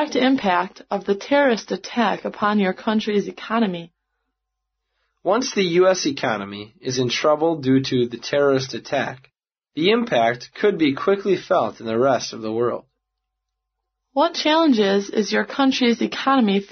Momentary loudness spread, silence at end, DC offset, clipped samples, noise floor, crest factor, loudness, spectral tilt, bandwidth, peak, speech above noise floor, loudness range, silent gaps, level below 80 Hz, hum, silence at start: 8 LU; 0.05 s; under 0.1%; under 0.1%; -80 dBFS; 16 dB; -20 LUFS; -3.5 dB/octave; 6.6 kHz; -4 dBFS; 60 dB; 3 LU; none; -64 dBFS; none; 0 s